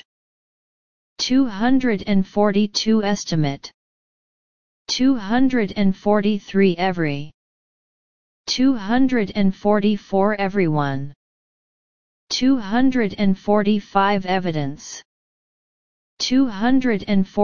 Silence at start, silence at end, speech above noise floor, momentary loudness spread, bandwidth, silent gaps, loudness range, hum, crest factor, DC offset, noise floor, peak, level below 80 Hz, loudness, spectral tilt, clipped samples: 0 s; 0 s; over 71 dB; 8 LU; 7.2 kHz; 0.05-1.16 s, 3.74-4.85 s, 7.34-8.44 s, 11.16-12.27 s, 15.05-16.17 s; 2 LU; none; 18 dB; 2%; under -90 dBFS; -2 dBFS; -48 dBFS; -20 LUFS; -5.5 dB/octave; under 0.1%